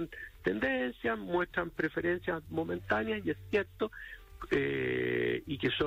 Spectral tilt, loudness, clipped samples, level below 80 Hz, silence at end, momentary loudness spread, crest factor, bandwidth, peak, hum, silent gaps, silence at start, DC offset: -7 dB/octave; -33 LUFS; under 0.1%; -56 dBFS; 0 s; 6 LU; 16 dB; 16 kHz; -18 dBFS; none; none; 0 s; under 0.1%